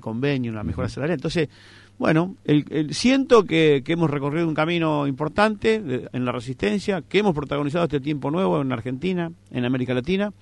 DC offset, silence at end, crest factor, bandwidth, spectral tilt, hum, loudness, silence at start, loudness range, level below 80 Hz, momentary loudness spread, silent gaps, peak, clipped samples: under 0.1%; 0.1 s; 18 dB; 11 kHz; -6.5 dB/octave; none; -22 LUFS; 0.05 s; 4 LU; -50 dBFS; 8 LU; none; -4 dBFS; under 0.1%